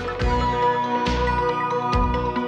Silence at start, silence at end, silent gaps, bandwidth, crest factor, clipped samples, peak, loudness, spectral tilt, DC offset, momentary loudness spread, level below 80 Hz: 0 s; 0 s; none; 8.8 kHz; 12 dB; under 0.1%; -8 dBFS; -22 LUFS; -6.5 dB/octave; under 0.1%; 2 LU; -30 dBFS